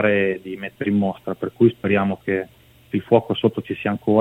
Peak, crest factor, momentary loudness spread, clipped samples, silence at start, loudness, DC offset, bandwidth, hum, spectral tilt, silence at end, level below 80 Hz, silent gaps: 0 dBFS; 20 dB; 10 LU; under 0.1%; 0 s; -21 LUFS; under 0.1%; 4.1 kHz; none; -8.5 dB/octave; 0 s; -60 dBFS; none